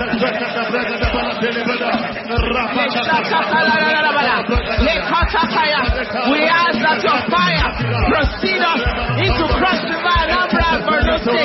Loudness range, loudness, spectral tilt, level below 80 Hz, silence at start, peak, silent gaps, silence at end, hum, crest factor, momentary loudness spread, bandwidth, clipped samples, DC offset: 2 LU; -16 LUFS; -6.5 dB/octave; -28 dBFS; 0 s; -4 dBFS; none; 0 s; none; 12 dB; 5 LU; 6 kHz; under 0.1%; under 0.1%